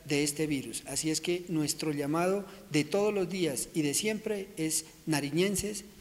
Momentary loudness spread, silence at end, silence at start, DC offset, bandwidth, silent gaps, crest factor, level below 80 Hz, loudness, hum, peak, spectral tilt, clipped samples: 5 LU; 0 s; 0 s; under 0.1%; 16 kHz; none; 18 dB; -60 dBFS; -31 LUFS; none; -14 dBFS; -4 dB/octave; under 0.1%